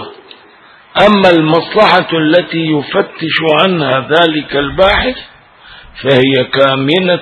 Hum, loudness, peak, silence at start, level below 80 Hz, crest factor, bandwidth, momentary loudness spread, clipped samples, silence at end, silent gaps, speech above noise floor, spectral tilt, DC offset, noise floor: none; -10 LUFS; 0 dBFS; 0 s; -36 dBFS; 12 dB; 11 kHz; 8 LU; 0.3%; 0 s; none; 31 dB; -6.5 dB/octave; under 0.1%; -41 dBFS